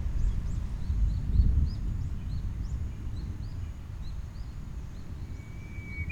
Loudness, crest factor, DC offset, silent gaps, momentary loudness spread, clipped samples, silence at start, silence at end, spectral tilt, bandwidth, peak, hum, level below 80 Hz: -35 LUFS; 18 dB; under 0.1%; none; 14 LU; under 0.1%; 0 s; 0 s; -7.5 dB/octave; 8 kHz; -12 dBFS; none; -32 dBFS